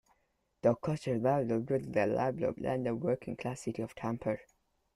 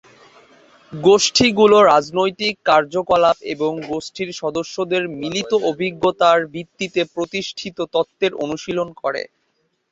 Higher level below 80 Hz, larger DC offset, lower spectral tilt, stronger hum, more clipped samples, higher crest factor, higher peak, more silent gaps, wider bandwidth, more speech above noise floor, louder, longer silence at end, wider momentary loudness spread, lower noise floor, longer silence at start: second, -64 dBFS vs -56 dBFS; neither; first, -7.5 dB/octave vs -3.5 dB/octave; neither; neither; about the same, 20 dB vs 18 dB; second, -14 dBFS vs -2 dBFS; neither; first, 12.5 kHz vs 8 kHz; second, 45 dB vs 50 dB; second, -34 LUFS vs -18 LUFS; second, 0.55 s vs 0.7 s; second, 8 LU vs 13 LU; first, -77 dBFS vs -68 dBFS; second, 0.65 s vs 0.9 s